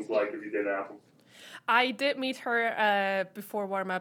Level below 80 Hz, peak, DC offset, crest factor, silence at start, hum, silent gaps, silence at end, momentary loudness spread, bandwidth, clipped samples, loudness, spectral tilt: under -90 dBFS; -10 dBFS; under 0.1%; 20 dB; 0 s; none; none; 0 s; 10 LU; 19 kHz; under 0.1%; -29 LUFS; -4 dB/octave